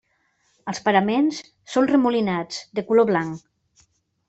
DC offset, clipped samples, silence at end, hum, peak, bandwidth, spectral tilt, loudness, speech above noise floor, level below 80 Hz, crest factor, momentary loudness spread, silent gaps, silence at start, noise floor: under 0.1%; under 0.1%; 0.9 s; none; -4 dBFS; 8.2 kHz; -5.5 dB/octave; -21 LUFS; 46 dB; -64 dBFS; 20 dB; 14 LU; none; 0.65 s; -67 dBFS